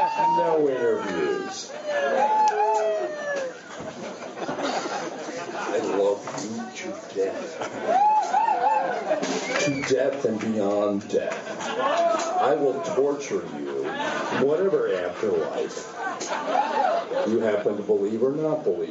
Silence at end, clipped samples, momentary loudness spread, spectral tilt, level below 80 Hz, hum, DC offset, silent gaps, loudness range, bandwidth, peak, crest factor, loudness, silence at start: 0 s; under 0.1%; 11 LU; -3.5 dB/octave; -74 dBFS; none; under 0.1%; none; 5 LU; 8 kHz; -8 dBFS; 16 dB; -25 LUFS; 0 s